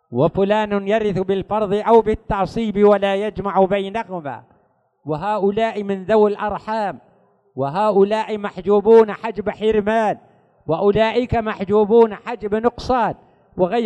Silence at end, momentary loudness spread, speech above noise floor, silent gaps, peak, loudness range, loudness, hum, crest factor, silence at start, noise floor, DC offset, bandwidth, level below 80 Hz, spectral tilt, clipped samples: 0 s; 12 LU; 43 dB; none; -2 dBFS; 4 LU; -18 LUFS; none; 16 dB; 0.1 s; -61 dBFS; under 0.1%; 8.8 kHz; -44 dBFS; -7.5 dB/octave; under 0.1%